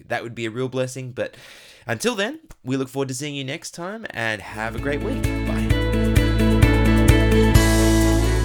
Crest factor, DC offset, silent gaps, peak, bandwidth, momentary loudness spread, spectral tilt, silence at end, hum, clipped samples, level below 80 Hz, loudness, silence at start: 18 dB; under 0.1%; none; -2 dBFS; 18 kHz; 14 LU; -5.5 dB/octave; 0 s; none; under 0.1%; -24 dBFS; -21 LUFS; 0.1 s